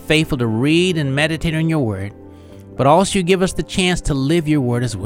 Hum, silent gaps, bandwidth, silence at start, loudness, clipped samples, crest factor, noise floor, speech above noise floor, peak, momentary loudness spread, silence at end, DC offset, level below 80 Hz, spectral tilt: none; none; 16 kHz; 0 s; -17 LUFS; under 0.1%; 16 dB; -38 dBFS; 22 dB; 0 dBFS; 6 LU; 0 s; under 0.1%; -34 dBFS; -5.5 dB/octave